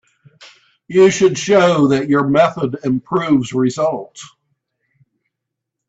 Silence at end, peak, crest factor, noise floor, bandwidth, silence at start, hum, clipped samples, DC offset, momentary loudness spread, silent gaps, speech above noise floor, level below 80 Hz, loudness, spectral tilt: 1.6 s; 0 dBFS; 16 dB; -80 dBFS; 8 kHz; 0.4 s; none; under 0.1%; under 0.1%; 9 LU; none; 65 dB; -56 dBFS; -15 LUFS; -5.5 dB/octave